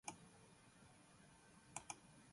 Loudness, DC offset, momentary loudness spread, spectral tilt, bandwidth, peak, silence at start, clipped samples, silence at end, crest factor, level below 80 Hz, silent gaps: -59 LUFS; under 0.1%; 13 LU; -2.5 dB/octave; 11.5 kHz; -32 dBFS; 0.05 s; under 0.1%; 0 s; 30 dB; -82 dBFS; none